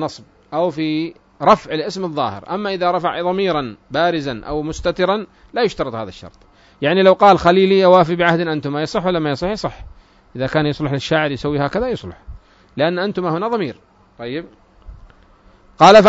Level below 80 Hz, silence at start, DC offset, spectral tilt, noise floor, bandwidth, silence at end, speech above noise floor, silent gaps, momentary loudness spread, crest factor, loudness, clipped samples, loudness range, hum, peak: -44 dBFS; 0 s; under 0.1%; -6 dB/octave; -49 dBFS; 7.8 kHz; 0 s; 33 dB; none; 16 LU; 18 dB; -17 LUFS; under 0.1%; 8 LU; none; 0 dBFS